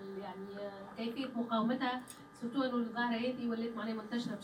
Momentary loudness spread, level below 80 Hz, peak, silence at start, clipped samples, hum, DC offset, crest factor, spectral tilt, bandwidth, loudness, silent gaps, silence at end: 11 LU; -76 dBFS; -22 dBFS; 0 s; under 0.1%; none; under 0.1%; 14 dB; -5.5 dB/octave; 13 kHz; -38 LUFS; none; 0 s